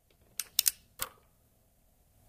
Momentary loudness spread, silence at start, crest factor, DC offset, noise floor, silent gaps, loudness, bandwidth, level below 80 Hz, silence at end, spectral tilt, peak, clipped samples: 12 LU; 0.4 s; 34 dB; under 0.1%; -68 dBFS; none; -32 LUFS; 16 kHz; -66 dBFS; 1.2 s; 2 dB/octave; -4 dBFS; under 0.1%